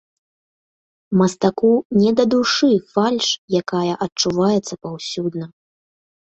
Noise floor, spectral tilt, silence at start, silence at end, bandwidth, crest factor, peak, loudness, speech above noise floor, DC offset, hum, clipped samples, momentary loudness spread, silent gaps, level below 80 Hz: under -90 dBFS; -5 dB/octave; 1.1 s; 0.85 s; 8.2 kHz; 16 dB; -4 dBFS; -18 LUFS; over 72 dB; under 0.1%; none; under 0.1%; 11 LU; 1.85-1.90 s, 3.38-3.48 s, 4.12-4.16 s; -60 dBFS